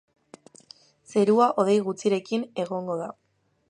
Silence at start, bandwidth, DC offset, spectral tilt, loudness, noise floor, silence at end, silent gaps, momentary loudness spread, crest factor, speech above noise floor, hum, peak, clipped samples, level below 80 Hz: 1.1 s; 11 kHz; under 0.1%; -6 dB/octave; -24 LUFS; -53 dBFS; 0.6 s; none; 11 LU; 18 dB; 30 dB; none; -8 dBFS; under 0.1%; -78 dBFS